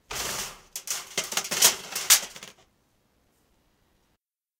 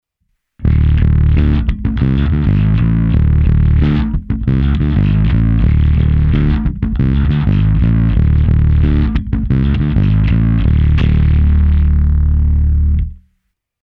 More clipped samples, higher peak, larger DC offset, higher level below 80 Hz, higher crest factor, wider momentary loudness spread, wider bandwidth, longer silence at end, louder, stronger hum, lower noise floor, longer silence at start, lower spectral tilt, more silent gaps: neither; about the same, -2 dBFS vs 0 dBFS; neither; second, -62 dBFS vs -14 dBFS; first, 26 dB vs 12 dB; first, 18 LU vs 4 LU; first, 18 kHz vs 4.4 kHz; first, 2.1 s vs 0.7 s; second, -23 LUFS vs -13 LUFS; neither; first, -76 dBFS vs -67 dBFS; second, 0.1 s vs 0.6 s; second, 1.5 dB/octave vs -10.5 dB/octave; neither